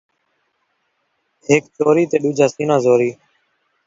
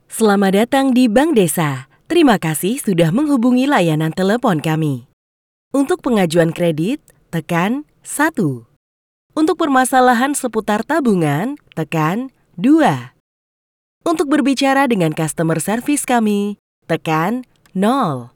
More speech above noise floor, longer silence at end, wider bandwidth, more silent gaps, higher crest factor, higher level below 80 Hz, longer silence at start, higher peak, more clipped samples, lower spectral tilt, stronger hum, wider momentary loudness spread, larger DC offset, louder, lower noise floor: second, 53 dB vs over 75 dB; first, 0.75 s vs 0.1 s; second, 7.8 kHz vs over 20 kHz; second, none vs 5.13-5.71 s, 8.76-9.30 s, 13.20-14.01 s, 16.59-16.82 s; about the same, 18 dB vs 16 dB; second, -62 dBFS vs -54 dBFS; first, 1.5 s vs 0.1 s; about the same, 0 dBFS vs -2 dBFS; neither; about the same, -6 dB/octave vs -5.5 dB/octave; neither; second, 4 LU vs 12 LU; neither; about the same, -16 LUFS vs -16 LUFS; second, -68 dBFS vs under -90 dBFS